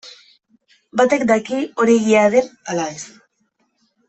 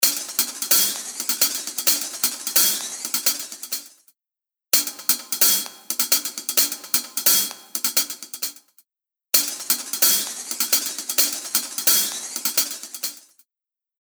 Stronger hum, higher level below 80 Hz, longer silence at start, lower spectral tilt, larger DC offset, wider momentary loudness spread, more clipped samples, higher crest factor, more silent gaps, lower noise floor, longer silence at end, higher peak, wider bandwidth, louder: neither; first, -62 dBFS vs under -90 dBFS; about the same, 0.05 s vs 0 s; first, -4.5 dB/octave vs 2 dB/octave; neither; about the same, 13 LU vs 11 LU; neither; second, 16 dB vs 24 dB; neither; second, -67 dBFS vs -89 dBFS; first, 1 s vs 0.8 s; about the same, -2 dBFS vs 0 dBFS; second, 8.4 kHz vs over 20 kHz; first, -17 LUFS vs -20 LUFS